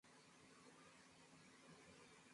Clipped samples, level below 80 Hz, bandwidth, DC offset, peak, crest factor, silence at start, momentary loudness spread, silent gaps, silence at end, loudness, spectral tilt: under 0.1%; under -90 dBFS; 11.5 kHz; under 0.1%; -52 dBFS; 14 dB; 0.05 s; 2 LU; none; 0 s; -66 LUFS; -3 dB/octave